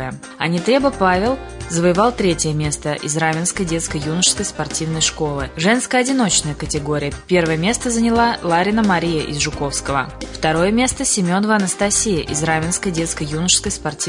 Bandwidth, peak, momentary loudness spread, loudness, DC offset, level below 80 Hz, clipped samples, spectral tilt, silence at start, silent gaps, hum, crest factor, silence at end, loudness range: 11 kHz; -2 dBFS; 7 LU; -18 LUFS; under 0.1%; -38 dBFS; under 0.1%; -3.5 dB/octave; 0 s; none; none; 16 dB; 0 s; 1 LU